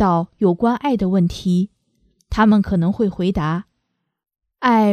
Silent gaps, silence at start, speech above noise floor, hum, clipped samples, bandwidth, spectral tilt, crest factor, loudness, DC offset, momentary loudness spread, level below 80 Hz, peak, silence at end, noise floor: none; 0 s; 57 dB; none; under 0.1%; 9.8 kHz; -8 dB/octave; 18 dB; -18 LUFS; under 0.1%; 8 LU; -40 dBFS; -2 dBFS; 0 s; -74 dBFS